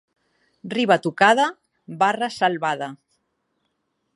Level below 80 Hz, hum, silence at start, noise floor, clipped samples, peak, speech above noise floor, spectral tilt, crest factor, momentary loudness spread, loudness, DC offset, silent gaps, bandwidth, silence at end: -72 dBFS; none; 0.65 s; -73 dBFS; under 0.1%; -2 dBFS; 53 dB; -4.5 dB/octave; 22 dB; 16 LU; -20 LUFS; under 0.1%; none; 11.5 kHz; 1.2 s